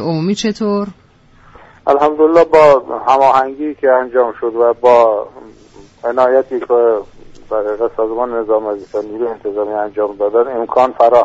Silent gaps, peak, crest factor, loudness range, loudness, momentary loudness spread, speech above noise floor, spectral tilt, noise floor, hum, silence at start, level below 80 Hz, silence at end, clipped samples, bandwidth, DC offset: none; 0 dBFS; 14 dB; 6 LU; -14 LUFS; 11 LU; 33 dB; -6 dB/octave; -46 dBFS; none; 0 s; -48 dBFS; 0 s; under 0.1%; 8 kHz; under 0.1%